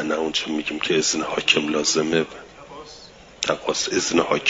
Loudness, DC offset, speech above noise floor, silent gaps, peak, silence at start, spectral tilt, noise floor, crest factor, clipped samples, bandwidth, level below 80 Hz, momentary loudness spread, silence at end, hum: -21 LUFS; under 0.1%; 23 dB; none; -4 dBFS; 0 s; -2.5 dB/octave; -45 dBFS; 20 dB; under 0.1%; 7.8 kHz; -56 dBFS; 22 LU; 0 s; none